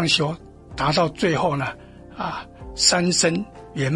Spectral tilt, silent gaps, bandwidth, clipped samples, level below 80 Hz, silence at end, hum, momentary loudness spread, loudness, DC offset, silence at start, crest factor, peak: -3.5 dB/octave; none; 11.5 kHz; under 0.1%; -46 dBFS; 0 s; none; 19 LU; -21 LUFS; under 0.1%; 0 s; 22 dB; -2 dBFS